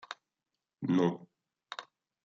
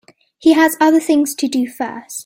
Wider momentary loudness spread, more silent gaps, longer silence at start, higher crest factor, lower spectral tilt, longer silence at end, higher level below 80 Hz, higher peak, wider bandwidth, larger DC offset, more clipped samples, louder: first, 18 LU vs 11 LU; neither; second, 0.1 s vs 0.4 s; first, 22 dB vs 14 dB; first, -7 dB/octave vs -2.5 dB/octave; first, 0.4 s vs 0 s; second, -82 dBFS vs -60 dBFS; second, -16 dBFS vs -2 dBFS; second, 7.6 kHz vs 16.5 kHz; neither; neither; second, -32 LUFS vs -15 LUFS